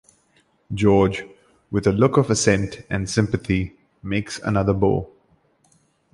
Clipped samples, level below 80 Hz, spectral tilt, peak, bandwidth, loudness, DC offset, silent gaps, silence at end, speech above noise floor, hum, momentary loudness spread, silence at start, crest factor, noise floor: under 0.1%; -42 dBFS; -6 dB/octave; -2 dBFS; 11.5 kHz; -21 LUFS; under 0.1%; none; 1.1 s; 42 dB; none; 13 LU; 0.7 s; 20 dB; -62 dBFS